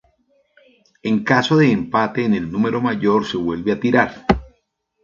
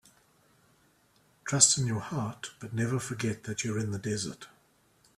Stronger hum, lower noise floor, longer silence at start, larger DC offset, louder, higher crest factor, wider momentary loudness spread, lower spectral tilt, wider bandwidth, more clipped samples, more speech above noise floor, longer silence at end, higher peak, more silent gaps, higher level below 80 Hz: neither; about the same, -68 dBFS vs -66 dBFS; second, 1.05 s vs 1.45 s; neither; first, -18 LUFS vs -29 LUFS; second, 18 dB vs 26 dB; second, 7 LU vs 17 LU; first, -7 dB/octave vs -3 dB/octave; second, 7.4 kHz vs 14 kHz; neither; first, 50 dB vs 36 dB; second, 0.55 s vs 0.7 s; first, 0 dBFS vs -6 dBFS; neither; first, -42 dBFS vs -64 dBFS